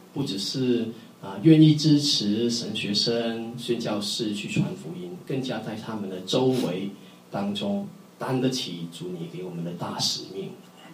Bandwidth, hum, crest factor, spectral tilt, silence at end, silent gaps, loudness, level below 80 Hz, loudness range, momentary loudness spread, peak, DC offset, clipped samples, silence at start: 15.5 kHz; none; 20 dB; -5.5 dB/octave; 0 s; none; -25 LUFS; -70 dBFS; 8 LU; 16 LU; -4 dBFS; under 0.1%; under 0.1%; 0 s